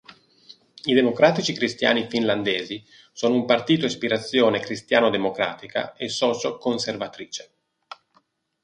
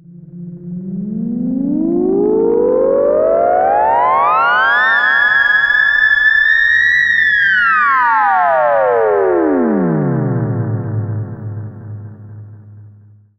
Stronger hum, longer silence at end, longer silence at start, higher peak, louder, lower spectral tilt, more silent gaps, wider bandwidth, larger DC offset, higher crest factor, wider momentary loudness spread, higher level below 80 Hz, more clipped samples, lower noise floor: neither; first, 1.2 s vs 0.5 s; about the same, 0.1 s vs 0.1 s; about the same, -2 dBFS vs -2 dBFS; second, -22 LUFS vs -12 LUFS; second, -4.5 dB/octave vs -7.5 dB/octave; neither; first, 10.5 kHz vs 7.6 kHz; neither; first, 22 dB vs 12 dB; second, 13 LU vs 16 LU; second, -66 dBFS vs -48 dBFS; neither; first, -65 dBFS vs -43 dBFS